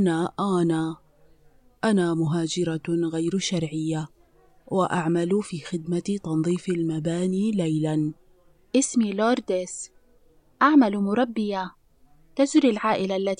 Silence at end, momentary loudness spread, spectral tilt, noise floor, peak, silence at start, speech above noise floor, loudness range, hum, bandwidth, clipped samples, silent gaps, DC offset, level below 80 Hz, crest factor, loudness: 0.05 s; 11 LU; -5.5 dB/octave; -57 dBFS; -6 dBFS; 0 s; 34 dB; 3 LU; none; 10.5 kHz; under 0.1%; none; under 0.1%; -62 dBFS; 18 dB; -24 LUFS